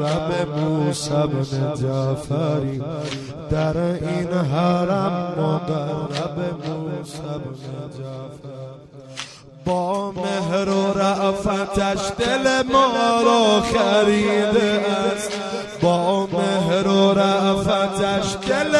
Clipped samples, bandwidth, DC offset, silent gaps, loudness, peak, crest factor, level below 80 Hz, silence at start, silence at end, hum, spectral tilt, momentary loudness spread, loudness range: under 0.1%; 12 kHz; under 0.1%; none; -20 LUFS; -4 dBFS; 18 dB; -46 dBFS; 0 s; 0 s; none; -5.5 dB/octave; 14 LU; 11 LU